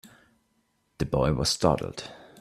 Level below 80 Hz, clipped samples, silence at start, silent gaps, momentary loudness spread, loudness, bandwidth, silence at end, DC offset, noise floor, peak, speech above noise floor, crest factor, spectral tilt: -44 dBFS; under 0.1%; 1 s; none; 15 LU; -26 LUFS; 15 kHz; 0.2 s; under 0.1%; -72 dBFS; -6 dBFS; 46 dB; 22 dB; -5 dB/octave